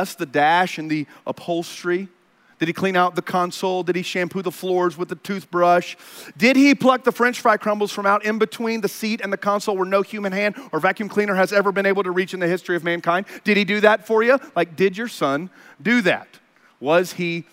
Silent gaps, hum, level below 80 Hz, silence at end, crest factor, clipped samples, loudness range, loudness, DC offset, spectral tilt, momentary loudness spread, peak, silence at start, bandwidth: none; none; -74 dBFS; 0.1 s; 20 dB; under 0.1%; 4 LU; -20 LUFS; under 0.1%; -5 dB/octave; 9 LU; 0 dBFS; 0 s; 16 kHz